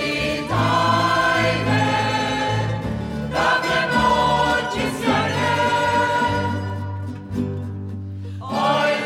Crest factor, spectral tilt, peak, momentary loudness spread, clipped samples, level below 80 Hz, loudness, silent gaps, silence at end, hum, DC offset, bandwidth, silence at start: 14 dB; -5 dB/octave; -8 dBFS; 11 LU; under 0.1%; -42 dBFS; -20 LUFS; none; 0 s; none; under 0.1%; 15.5 kHz; 0 s